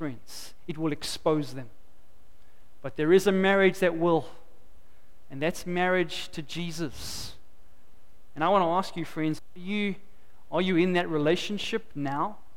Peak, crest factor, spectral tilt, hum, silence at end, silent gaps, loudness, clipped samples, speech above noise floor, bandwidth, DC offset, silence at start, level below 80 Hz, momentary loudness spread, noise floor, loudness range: -10 dBFS; 20 dB; -5.5 dB/octave; none; 0.25 s; none; -27 LUFS; under 0.1%; 31 dB; 16.5 kHz; 1%; 0 s; -56 dBFS; 18 LU; -58 dBFS; 6 LU